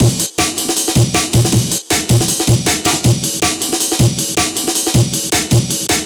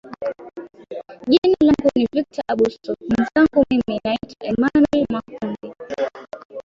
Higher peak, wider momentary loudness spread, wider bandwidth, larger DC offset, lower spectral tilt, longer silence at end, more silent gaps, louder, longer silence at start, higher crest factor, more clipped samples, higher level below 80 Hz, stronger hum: about the same, 0 dBFS vs -2 dBFS; second, 2 LU vs 19 LU; first, over 20 kHz vs 7.4 kHz; neither; second, -3.5 dB/octave vs -6.5 dB/octave; about the same, 0 s vs 0.05 s; second, none vs 1.38-1.42 s, 6.45-6.49 s; first, -14 LUFS vs -19 LUFS; about the same, 0 s vs 0.05 s; about the same, 14 dB vs 16 dB; neither; first, -34 dBFS vs -50 dBFS; neither